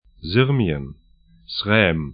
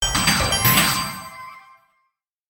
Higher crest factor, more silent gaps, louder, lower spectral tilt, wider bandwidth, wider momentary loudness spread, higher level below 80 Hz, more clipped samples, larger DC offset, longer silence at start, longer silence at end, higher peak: about the same, 20 dB vs 18 dB; neither; second, -20 LUFS vs -17 LUFS; first, -11.5 dB/octave vs -2 dB/octave; second, 5.2 kHz vs 19 kHz; second, 13 LU vs 21 LU; about the same, -42 dBFS vs -38 dBFS; neither; neither; first, 0.2 s vs 0 s; second, 0 s vs 0.9 s; about the same, -2 dBFS vs -4 dBFS